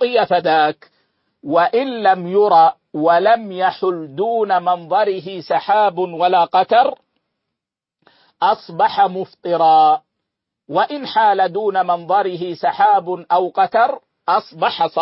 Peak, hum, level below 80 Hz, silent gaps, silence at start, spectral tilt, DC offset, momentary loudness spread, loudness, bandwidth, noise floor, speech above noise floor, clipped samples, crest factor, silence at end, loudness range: -2 dBFS; none; -68 dBFS; none; 0 s; -9 dB/octave; under 0.1%; 8 LU; -16 LUFS; 5.8 kHz; -84 dBFS; 68 dB; under 0.1%; 14 dB; 0 s; 2 LU